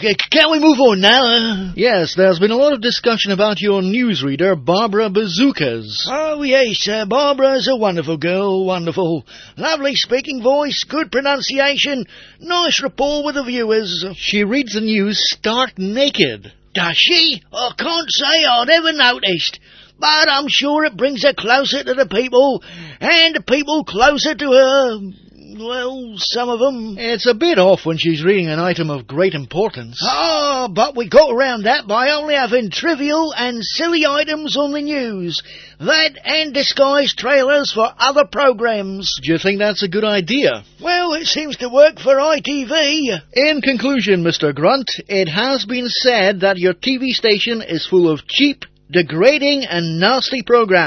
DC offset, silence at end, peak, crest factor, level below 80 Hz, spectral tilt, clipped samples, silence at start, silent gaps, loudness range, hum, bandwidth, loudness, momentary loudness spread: under 0.1%; 0 s; 0 dBFS; 16 dB; -50 dBFS; -4 dB/octave; under 0.1%; 0 s; none; 4 LU; none; 6.6 kHz; -15 LUFS; 8 LU